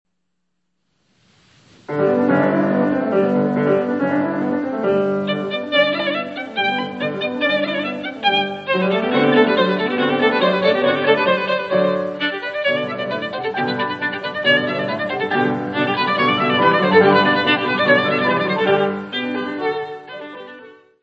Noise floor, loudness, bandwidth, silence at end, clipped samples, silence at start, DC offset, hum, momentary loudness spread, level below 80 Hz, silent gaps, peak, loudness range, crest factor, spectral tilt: -75 dBFS; -18 LUFS; 7.6 kHz; 0.3 s; under 0.1%; 1.9 s; under 0.1%; none; 9 LU; -66 dBFS; none; 0 dBFS; 5 LU; 18 dB; -7 dB/octave